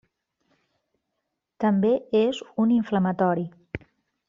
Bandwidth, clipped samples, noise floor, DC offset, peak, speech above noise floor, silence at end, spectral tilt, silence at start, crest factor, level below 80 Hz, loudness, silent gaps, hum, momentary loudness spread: 7.6 kHz; under 0.1%; -81 dBFS; under 0.1%; -8 dBFS; 58 dB; 0.5 s; -6.5 dB/octave; 1.6 s; 16 dB; -60 dBFS; -24 LUFS; none; none; 16 LU